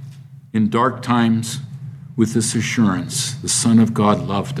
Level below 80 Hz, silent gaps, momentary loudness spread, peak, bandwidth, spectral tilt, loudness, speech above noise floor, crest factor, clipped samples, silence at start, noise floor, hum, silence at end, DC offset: -56 dBFS; none; 14 LU; -2 dBFS; 14.5 kHz; -4.5 dB/octave; -18 LUFS; 21 dB; 18 dB; under 0.1%; 0 s; -38 dBFS; none; 0 s; under 0.1%